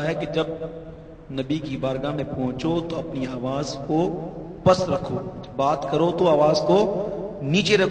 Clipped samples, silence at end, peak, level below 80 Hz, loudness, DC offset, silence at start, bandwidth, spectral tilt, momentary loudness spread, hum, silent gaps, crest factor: under 0.1%; 0 s; -4 dBFS; -48 dBFS; -23 LUFS; under 0.1%; 0 s; 9.6 kHz; -6 dB/octave; 14 LU; none; none; 20 dB